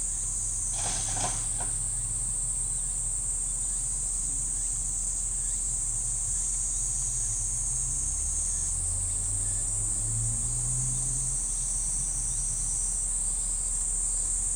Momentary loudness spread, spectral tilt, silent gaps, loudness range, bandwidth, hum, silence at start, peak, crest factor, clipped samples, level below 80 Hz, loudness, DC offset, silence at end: 1 LU; -1.5 dB/octave; none; 1 LU; over 20 kHz; none; 0 s; -16 dBFS; 14 dB; under 0.1%; -38 dBFS; -27 LUFS; under 0.1%; 0 s